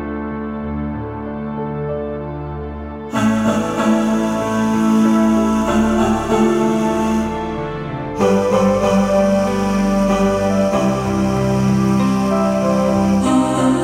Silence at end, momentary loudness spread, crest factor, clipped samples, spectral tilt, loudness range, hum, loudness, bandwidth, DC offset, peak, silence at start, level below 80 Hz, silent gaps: 0 s; 10 LU; 14 dB; under 0.1%; -6.5 dB/octave; 5 LU; none; -17 LUFS; 15 kHz; under 0.1%; -2 dBFS; 0 s; -36 dBFS; none